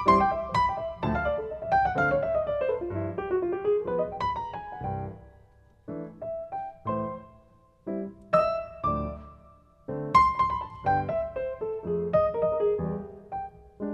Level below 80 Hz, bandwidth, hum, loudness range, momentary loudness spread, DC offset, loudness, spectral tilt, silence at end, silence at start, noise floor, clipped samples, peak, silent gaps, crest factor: -48 dBFS; 9 kHz; none; 9 LU; 14 LU; under 0.1%; -28 LUFS; -7.5 dB/octave; 0 s; 0 s; -58 dBFS; under 0.1%; -8 dBFS; none; 20 dB